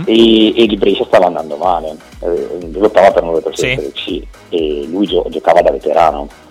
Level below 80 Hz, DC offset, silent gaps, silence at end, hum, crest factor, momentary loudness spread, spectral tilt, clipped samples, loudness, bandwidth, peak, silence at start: -36 dBFS; under 0.1%; none; 0.2 s; none; 12 dB; 13 LU; -5 dB/octave; under 0.1%; -13 LUFS; 13 kHz; 0 dBFS; 0 s